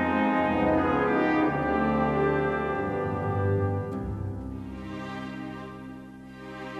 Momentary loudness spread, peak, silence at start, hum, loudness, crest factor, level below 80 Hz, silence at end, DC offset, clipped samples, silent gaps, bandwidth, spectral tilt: 16 LU; -12 dBFS; 0 s; none; -27 LUFS; 16 dB; -46 dBFS; 0 s; under 0.1%; under 0.1%; none; 8.6 kHz; -8.5 dB/octave